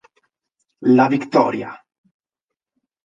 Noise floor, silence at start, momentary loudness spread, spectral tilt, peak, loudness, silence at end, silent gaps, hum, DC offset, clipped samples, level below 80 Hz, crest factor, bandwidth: -85 dBFS; 0.8 s; 13 LU; -7.5 dB/octave; 0 dBFS; -17 LUFS; 1.3 s; none; none; under 0.1%; under 0.1%; -68 dBFS; 20 dB; 7.4 kHz